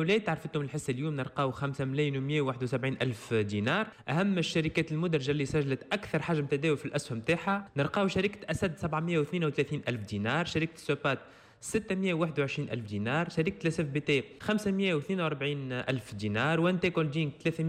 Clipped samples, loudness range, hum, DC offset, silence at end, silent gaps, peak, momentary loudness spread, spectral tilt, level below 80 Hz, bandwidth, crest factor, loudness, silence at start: under 0.1%; 2 LU; none; under 0.1%; 0 s; none; -16 dBFS; 5 LU; -6 dB/octave; -60 dBFS; 13.5 kHz; 14 dB; -31 LUFS; 0 s